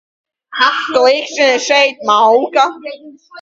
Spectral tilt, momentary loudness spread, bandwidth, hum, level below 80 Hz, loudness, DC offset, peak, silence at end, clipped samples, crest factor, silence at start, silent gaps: -1 dB/octave; 10 LU; 7.8 kHz; none; -64 dBFS; -12 LUFS; under 0.1%; 0 dBFS; 0 s; under 0.1%; 14 dB; 0.5 s; none